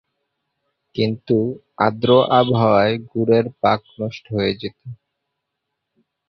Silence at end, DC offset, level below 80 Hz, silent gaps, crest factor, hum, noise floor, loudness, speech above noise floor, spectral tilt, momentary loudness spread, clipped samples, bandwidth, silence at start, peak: 1.35 s; under 0.1%; -54 dBFS; none; 18 dB; none; -78 dBFS; -18 LUFS; 60 dB; -8.5 dB/octave; 14 LU; under 0.1%; 6.2 kHz; 0.95 s; -2 dBFS